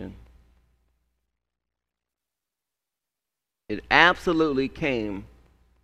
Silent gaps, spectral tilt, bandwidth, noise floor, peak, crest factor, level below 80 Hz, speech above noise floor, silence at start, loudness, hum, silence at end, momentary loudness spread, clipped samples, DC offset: none; -5 dB/octave; 12.5 kHz; -87 dBFS; 0 dBFS; 28 dB; -52 dBFS; 65 dB; 0 s; -22 LUFS; none; 0.55 s; 19 LU; under 0.1%; under 0.1%